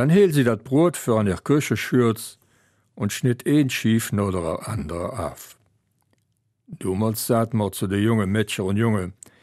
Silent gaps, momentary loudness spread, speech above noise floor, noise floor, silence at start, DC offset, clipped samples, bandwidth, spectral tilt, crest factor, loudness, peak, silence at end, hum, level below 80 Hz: none; 10 LU; 49 dB; -70 dBFS; 0 s; under 0.1%; under 0.1%; 15.5 kHz; -6 dB/octave; 16 dB; -22 LUFS; -6 dBFS; 0.3 s; none; -52 dBFS